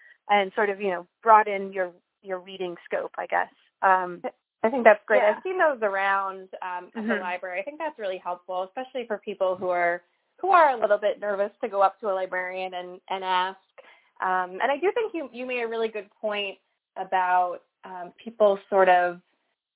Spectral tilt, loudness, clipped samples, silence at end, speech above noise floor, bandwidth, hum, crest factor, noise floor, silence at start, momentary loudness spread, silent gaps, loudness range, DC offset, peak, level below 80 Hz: -7.5 dB/octave; -25 LUFS; under 0.1%; 0.55 s; 29 dB; 4 kHz; none; 24 dB; -54 dBFS; 0.25 s; 15 LU; none; 6 LU; under 0.1%; 0 dBFS; -80 dBFS